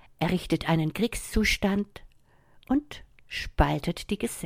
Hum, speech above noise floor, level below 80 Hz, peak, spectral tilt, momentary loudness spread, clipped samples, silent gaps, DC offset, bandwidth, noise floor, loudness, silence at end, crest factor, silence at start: none; 32 dB; -38 dBFS; -6 dBFS; -5 dB/octave; 11 LU; under 0.1%; none; under 0.1%; 16.5 kHz; -59 dBFS; -28 LUFS; 0 s; 22 dB; 0.2 s